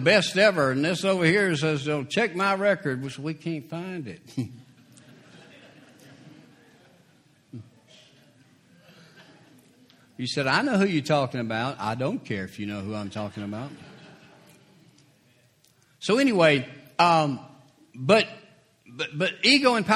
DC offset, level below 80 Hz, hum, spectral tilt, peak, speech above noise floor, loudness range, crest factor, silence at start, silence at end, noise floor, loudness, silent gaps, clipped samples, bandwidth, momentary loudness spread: under 0.1%; -68 dBFS; none; -5 dB/octave; -4 dBFS; 38 dB; 15 LU; 22 dB; 0 s; 0 s; -62 dBFS; -24 LUFS; none; under 0.1%; 14 kHz; 16 LU